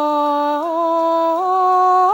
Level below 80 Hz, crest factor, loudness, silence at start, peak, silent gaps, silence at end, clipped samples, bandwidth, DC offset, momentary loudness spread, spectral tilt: -74 dBFS; 10 dB; -16 LUFS; 0 s; -6 dBFS; none; 0 s; under 0.1%; 16.5 kHz; under 0.1%; 5 LU; -4 dB/octave